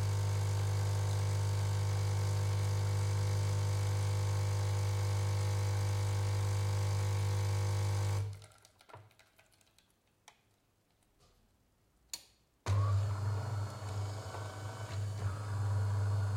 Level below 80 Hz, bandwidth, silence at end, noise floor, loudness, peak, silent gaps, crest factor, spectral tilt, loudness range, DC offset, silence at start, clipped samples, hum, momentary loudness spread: -60 dBFS; 15.5 kHz; 0 s; -74 dBFS; -35 LUFS; -24 dBFS; none; 12 dB; -5.5 dB/octave; 8 LU; under 0.1%; 0 s; under 0.1%; none; 8 LU